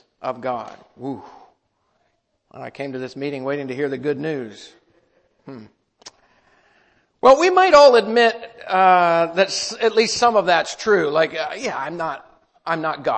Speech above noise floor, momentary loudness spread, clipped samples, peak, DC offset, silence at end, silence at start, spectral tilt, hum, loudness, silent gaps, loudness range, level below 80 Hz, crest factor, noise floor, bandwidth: 50 dB; 19 LU; under 0.1%; -2 dBFS; under 0.1%; 0 s; 0.25 s; -3.5 dB/octave; none; -18 LUFS; none; 16 LU; -60 dBFS; 18 dB; -68 dBFS; 8.8 kHz